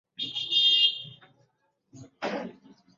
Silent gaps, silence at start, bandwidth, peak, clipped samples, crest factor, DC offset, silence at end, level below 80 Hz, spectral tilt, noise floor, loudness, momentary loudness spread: none; 0.2 s; 7.8 kHz; -12 dBFS; under 0.1%; 18 dB; under 0.1%; 0.45 s; -78 dBFS; -2 dB/octave; -72 dBFS; -23 LUFS; 21 LU